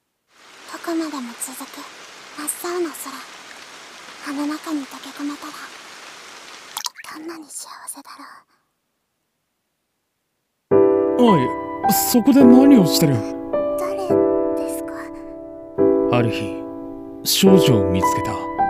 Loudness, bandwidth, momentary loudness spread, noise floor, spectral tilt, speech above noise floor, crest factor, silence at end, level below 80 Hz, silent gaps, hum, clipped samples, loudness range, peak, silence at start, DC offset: -18 LUFS; 16 kHz; 24 LU; -73 dBFS; -5 dB/octave; 56 dB; 20 dB; 0 s; -52 dBFS; none; none; under 0.1%; 19 LU; 0 dBFS; 0.65 s; under 0.1%